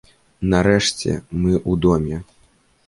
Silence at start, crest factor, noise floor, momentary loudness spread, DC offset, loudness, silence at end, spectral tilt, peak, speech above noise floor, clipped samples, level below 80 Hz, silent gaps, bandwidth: 0.4 s; 18 dB; -57 dBFS; 10 LU; under 0.1%; -19 LUFS; 0.65 s; -5.5 dB/octave; -2 dBFS; 39 dB; under 0.1%; -36 dBFS; none; 11.5 kHz